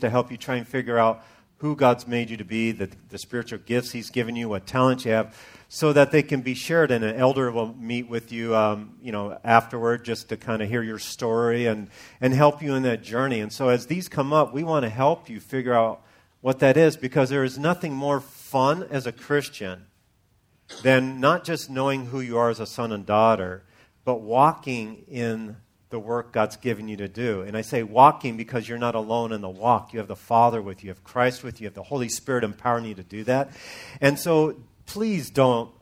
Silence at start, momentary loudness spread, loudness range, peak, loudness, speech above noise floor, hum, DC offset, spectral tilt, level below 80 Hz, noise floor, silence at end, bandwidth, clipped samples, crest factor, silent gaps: 0 s; 13 LU; 4 LU; 0 dBFS; -24 LUFS; 41 dB; none; under 0.1%; -6 dB/octave; -62 dBFS; -64 dBFS; 0.15 s; 16 kHz; under 0.1%; 24 dB; none